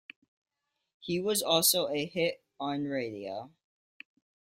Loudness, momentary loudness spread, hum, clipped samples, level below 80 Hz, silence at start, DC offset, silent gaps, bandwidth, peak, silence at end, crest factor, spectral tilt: -30 LUFS; 16 LU; none; under 0.1%; -74 dBFS; 1 s; under 0.1%; none; 16 kHz; -10 dBFS; 1 s; 22 dB; -2.5 dB/octave